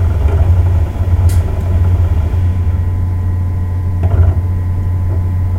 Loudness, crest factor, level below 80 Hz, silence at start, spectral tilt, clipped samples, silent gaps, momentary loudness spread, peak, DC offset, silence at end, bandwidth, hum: -14 LUFS; 12 dB; -18 dBFS; 0 s; -8.5 dB/octave; under 0.1%; none; 5 LU; 0 dBFS; under 0.1%; 0 s; 3.6 kHz; none